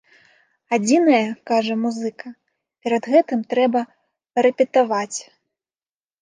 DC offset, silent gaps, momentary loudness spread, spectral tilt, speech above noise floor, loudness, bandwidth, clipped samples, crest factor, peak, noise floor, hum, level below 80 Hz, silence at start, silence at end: under 0.1%; none; 14 LU; -4.5 dB/octave; over 71 dB; -20 LUFS; 10 kHz; under 0.1%; 18 dB; -4 dBFS; under -90 dBFS; none; -76 dBFS; 0.7 s; 1 s